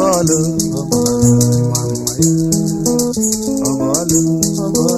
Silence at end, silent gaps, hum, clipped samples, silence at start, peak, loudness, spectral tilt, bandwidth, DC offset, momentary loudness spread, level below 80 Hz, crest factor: 0 s; none; none; under 0.1%; 0 s; 0 dBFS; -14 LUFS; -5.5 dB/octave; 15.5 kHz; under 0.1%; 5 LU; -40 dBFS; 14 dB